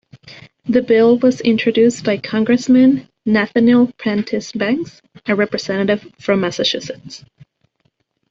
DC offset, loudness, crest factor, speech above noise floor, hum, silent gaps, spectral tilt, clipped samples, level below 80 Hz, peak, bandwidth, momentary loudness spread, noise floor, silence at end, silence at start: under 0.1%; -16 LUFS; 14 dB; 50 dB; none; none; -5.5 dB/octave; under 0.1%; -56 dBFS; -2 dBFS; 7.6 kHz; 13 LU; -65 dBFS; 1.15 s; 0.25 s